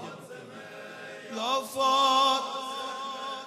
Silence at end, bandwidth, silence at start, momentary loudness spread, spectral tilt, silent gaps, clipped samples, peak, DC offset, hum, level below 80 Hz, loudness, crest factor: 0 s; 14 kHz; 0 s; 21 LU; -1.5 dB/octave; none; under 0.1%; -14 dBFS; under 0.1%; none; -86 dBFS; -27 LUFS; 16 dB